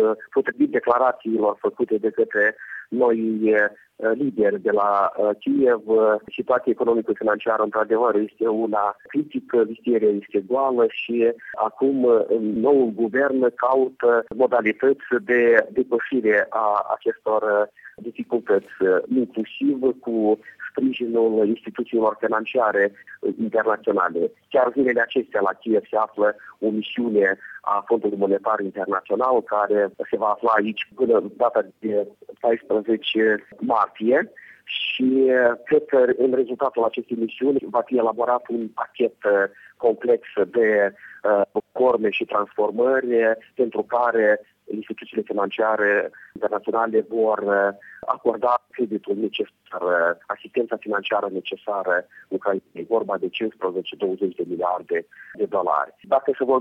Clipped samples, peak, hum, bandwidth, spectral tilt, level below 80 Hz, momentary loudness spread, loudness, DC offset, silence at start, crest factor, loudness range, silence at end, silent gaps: under 0.1%; -2 dBFS; none; 4.1 kHz; -7.5 dB/octave; -68 dBFS; 8 LU; -22 LUFS; under 0.1%; 0 s; 18 dB; 4 LU; 0 s; none